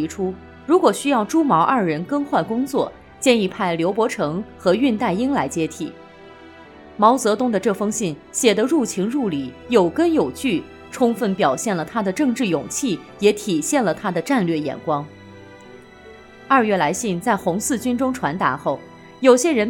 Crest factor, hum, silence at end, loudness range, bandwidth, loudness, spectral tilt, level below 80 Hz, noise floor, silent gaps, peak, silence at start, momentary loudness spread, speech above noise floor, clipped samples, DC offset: 20 dB; none; 0 s; 3 LU; 18 kHz; -20 LUFS; -4.5 dB/octave; -58 dBFS; -43 dBFS; none; 0 dBFS; 0 s; 8 LU; 24 dB; under 0.1%; under 0.1%